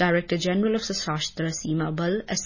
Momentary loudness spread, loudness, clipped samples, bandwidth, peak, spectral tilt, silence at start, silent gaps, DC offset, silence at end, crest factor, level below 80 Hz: 4 LU; -26 LUFS; under 0.1%; 7.4 kHz; -8 dBFS; -4.5 dB/octave; 0 s; none; under 0.1%; 0 s; 18 dB; -52 dBFS